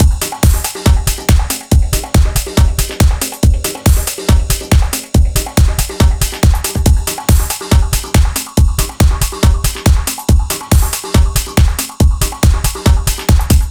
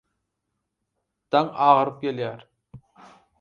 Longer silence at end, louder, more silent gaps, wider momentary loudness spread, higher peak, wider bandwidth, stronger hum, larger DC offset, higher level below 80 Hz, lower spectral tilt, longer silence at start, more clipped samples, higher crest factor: second, 0 s vs 0.65 s; first, -13 LUFS vs -22 LUFS; neither; second, 1 LU vs 13 LU; first, 0 dBFS vs -4 dBFS; first, over 20 kHz vs 7 kHz; neither; neither; first, -14 dBFS vs -68 dBFS; second, -4.5 dB/octave vs -7.5 dB/octave; second, 0 s vs 1.3 s; neither; second, 12 dB vs 22 dB